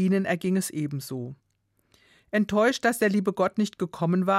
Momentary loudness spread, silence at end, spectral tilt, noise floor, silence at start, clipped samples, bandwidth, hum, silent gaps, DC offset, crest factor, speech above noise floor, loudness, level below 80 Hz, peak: 10 LU; 0 s; -6 dB/octave; -71 dBFS; 0 s; under 0.1%; 15.5 kHz; none; none; under 0.1%; 16 dB; 46 dB; -26 LUFS; -66 dBFS; -10 dBFS